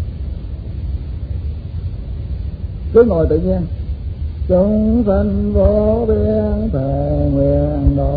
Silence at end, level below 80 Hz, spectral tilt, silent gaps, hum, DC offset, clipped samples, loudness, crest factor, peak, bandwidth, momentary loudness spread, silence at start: 0 s; -22 dBFS; -13 dB/octave; none; none; under 0.1%; under 0.1%; -17 LUFS; 16 dB; 0 dBFS; 4.9 kHz; 13 LU; 0 s